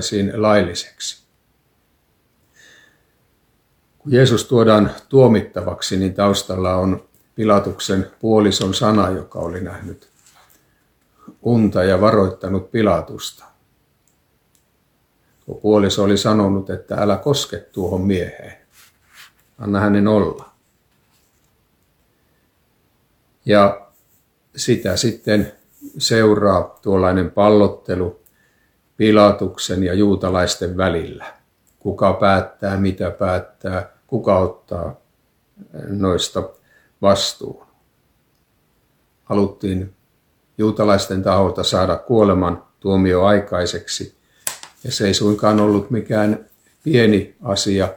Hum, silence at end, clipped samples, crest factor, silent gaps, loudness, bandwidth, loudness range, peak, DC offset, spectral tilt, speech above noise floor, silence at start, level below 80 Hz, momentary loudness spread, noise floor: none; 0 s; under 0.1%; 18 dB; none; -17 LUFS; 19 kHz; 6 LU; 0 dBFS; under 0.1%; -5.5 dB/octave; 46 dB; 0 s; -48 dBFS; 15 LU; -62 dBFS